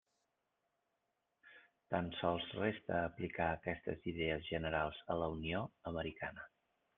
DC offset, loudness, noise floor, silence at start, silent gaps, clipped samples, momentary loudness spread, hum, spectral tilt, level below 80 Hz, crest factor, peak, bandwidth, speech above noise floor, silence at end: under 0.1%; -41 LUFS; -86 dBFS; 1.45 s; none; under 0.1%; 6 LU; none; -4 dB/octave; -64 dBFS; 22 dB; -20 dBFS; 4.2 kHz; 46 dB; 0.5 s